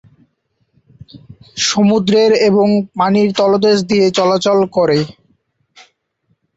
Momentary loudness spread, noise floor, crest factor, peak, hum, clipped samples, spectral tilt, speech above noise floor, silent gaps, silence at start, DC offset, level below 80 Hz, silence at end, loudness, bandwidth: 5 LU; -64 dBFS; 12 dB; -2 dBFS; none; under 0.1%; -5 dB/octave; 52 dB; none; 1.15 s; under 0.1%; -54 dBFS; 1.5 s; -13 LUFS; 8 kHz